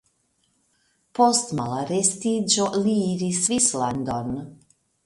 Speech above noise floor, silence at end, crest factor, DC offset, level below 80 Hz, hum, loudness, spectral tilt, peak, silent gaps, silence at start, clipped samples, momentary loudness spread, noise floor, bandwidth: 46 dB; 0.5 s; 20 dB; under 0.1%; -58 dBFS; none; -22 LUFS; -4 dB/octave; -4 dBFS; none; 1.15 s; under 0.1%; 11 LU; -69 dBFS; 11.5 kHz